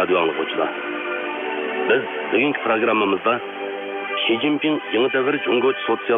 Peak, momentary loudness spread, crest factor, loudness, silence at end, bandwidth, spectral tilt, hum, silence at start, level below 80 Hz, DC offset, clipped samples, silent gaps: -6 dBFS; 7 LU; 16 dB; -21 LUFS; 0 s; 3.9 kHz; -7.5 dB/octave; none; 0 s; -70 dBFS; under 0.1%; under 0.1%; none